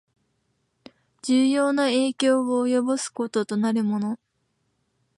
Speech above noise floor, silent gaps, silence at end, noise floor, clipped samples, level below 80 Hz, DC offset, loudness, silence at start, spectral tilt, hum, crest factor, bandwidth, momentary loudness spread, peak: 50 dB; none; 1 s; -72 dBFS; under 0.1%; -76 dBFS; under 0.1%; -23 LUFS; 1.25 s; -4.5 dB/octave; none; 16 dB; 11.5 kHz; 7 LU; -10 dBFS